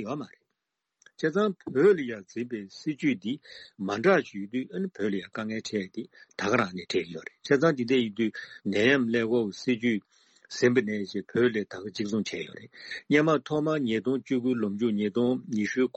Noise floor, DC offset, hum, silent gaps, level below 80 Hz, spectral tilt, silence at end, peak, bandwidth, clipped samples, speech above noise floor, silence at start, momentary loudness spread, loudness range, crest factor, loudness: -84 dBFS; under 0.1%; none; none; -72 dBFS; -6 dB/octave; 0.1 s; -8 dBFS; 8.6 kHz; under 0.1%; 57 dB; 0 s; 14 LU; 3 LU; 18 dB; -28 LUFS